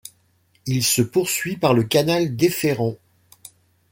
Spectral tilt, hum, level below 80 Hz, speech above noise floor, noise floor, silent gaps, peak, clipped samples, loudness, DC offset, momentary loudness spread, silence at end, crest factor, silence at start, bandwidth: -4.5 dB/octave; none; -58 dBFS; 42 dB; -62 dBFS; none; -2 dBFS; under 0.1%; -20 LUFS; under 0.1%; 8 LU; 0.95 s; 20 dB; 0.05 s; 17 kHz